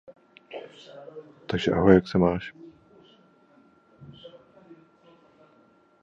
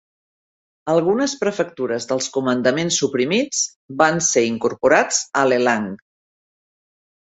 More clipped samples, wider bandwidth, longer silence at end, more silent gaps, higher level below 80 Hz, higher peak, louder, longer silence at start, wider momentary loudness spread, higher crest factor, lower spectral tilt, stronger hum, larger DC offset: neither; second, 7.6 kHz vs 8.4 kHz; first, 1.75 s vs 1.45 s; second, none vs 3.76-3.88 s; first, -50 dBFS vs -62 dBFS; about the same, -2 dBFS vs -2 dBFS; second, -23 LUFS vs -19 LUFS; second, 0.5 s vs 0.85 s; first, 27 LU vs 8 LU; first, 26 dB vs 20 dB; first, -8 dB/octave vs -3 dB/octave; neither; neither